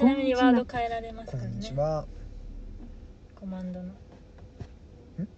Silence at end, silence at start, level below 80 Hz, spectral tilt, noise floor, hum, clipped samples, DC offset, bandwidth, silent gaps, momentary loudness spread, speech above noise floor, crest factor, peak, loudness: 0 s; 0 s; -46 dBFS; -7 dB/octave; -49 dBFS; none; under 0.1%; under 0.1%; 7.8 kHz; none; 25 LU; 21 dB; 20 dB; -10 dBFS; -28 LUFS